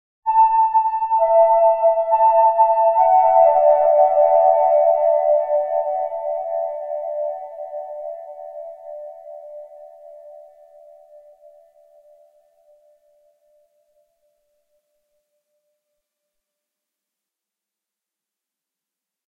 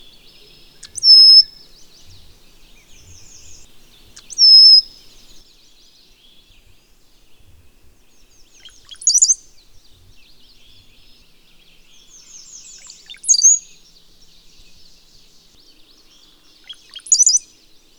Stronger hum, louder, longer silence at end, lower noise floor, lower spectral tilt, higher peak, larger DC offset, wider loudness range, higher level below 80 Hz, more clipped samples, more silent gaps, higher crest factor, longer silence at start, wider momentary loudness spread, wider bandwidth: neither; second, -16 LUFS vs -8 LUFS; first, 8.95 s vs 0.6 s; first, -87 dBFS vs -50 dBFS; first, -5.5 dB/octave vs 4 dB/octave; about the same, -2 dBFS vs 0 dBFS; neither; first, 21 LU vs 8 LU; second, -66 dBFS vs -54 dBFS; neither; neither; about the same, 18 dB vs 18 dB; second, 0.25 s vs 1 s; about the same, 22 LU vs 22 LU; second, 2.8 kHz vs over 20 kHz